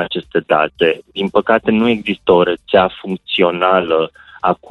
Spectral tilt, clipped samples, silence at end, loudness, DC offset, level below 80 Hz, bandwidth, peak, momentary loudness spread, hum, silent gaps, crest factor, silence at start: -7 dB/octave; under 0.1%; 0.15 s; -15 LUFS; under 0.1%; -50 dBFS; 5 kHz; 0 dBFS; 7 LU; none; none; 14 dB; 0 s